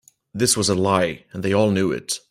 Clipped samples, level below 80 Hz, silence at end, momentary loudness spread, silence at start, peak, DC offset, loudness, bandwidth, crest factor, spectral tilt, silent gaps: under 0.1%; -56 dBFS; 0.1 s; 8 LU; 0.35 s; -2 dBFS; under 0.1%; -20 LUFS; 16 kHz; 18 dB; -4 dB/octave; none